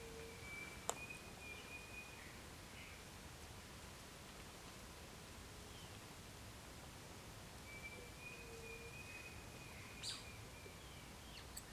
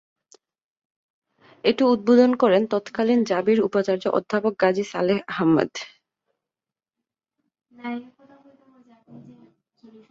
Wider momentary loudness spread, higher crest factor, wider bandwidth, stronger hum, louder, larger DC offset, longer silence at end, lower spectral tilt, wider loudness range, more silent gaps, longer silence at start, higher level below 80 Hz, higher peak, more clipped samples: second, 8 LU vs 16 LU; first, 32 dB vs 20 dB; first, 16 kHz vs 7.6 kHz; neither; second, -53 LUFS vs -21 LUFS; neither; second, 0 s vs 0.9 s; second, -3 dB/octave vs -6 dB/octave; second, 4 LU vs 21 LU; neither; second, 0 s vs 1.65 s; about the same, -64 dBFS vs -66 dBFS; second, -22 dBFS vs -4 dBFS; neither